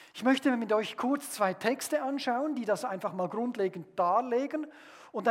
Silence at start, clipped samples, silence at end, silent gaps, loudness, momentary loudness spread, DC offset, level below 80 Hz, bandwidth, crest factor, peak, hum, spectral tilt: 0 s; under 0.1%; 0 s; none; -31 LUFS; 7 LU; under 0.1%; -88 dBFS; 16.5 kHz; 18 dB; -12 dBFS; none; -4.5 dB/octave